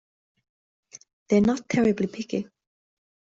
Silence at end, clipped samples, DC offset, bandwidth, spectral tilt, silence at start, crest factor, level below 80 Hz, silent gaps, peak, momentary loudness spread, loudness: 0.95 s; under 0.1%; under 0.1%; 7.8 kHz; -6.5 dB/octave; 1.3 s; 18 dB; -58 dBFS; none; -8 dBFS; 10 LU; -24 LUFS